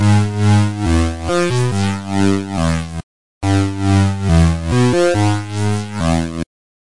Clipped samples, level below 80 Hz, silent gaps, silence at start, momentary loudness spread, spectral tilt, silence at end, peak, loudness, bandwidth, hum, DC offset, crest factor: under 0.1%; -32 dBFS; 3.03-3.41 s; 0 s; 8 LU; -6.5 dB/octave; 0.4 s; -2 dBFS; -16 LUFS; 11.5 kHz; none; 2%; 14 dB